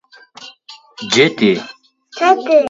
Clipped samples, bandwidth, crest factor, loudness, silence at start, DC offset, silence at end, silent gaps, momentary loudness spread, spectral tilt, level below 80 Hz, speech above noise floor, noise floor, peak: under 0.1%; 7.8 kHz; 16 dB; -14 LUFS; 0.4 s; under 0.1%; 0 s; none; 24 LU; -4 dB/octave; -62 dBFS; 28 dB; -41 dBFS; 0 dBFS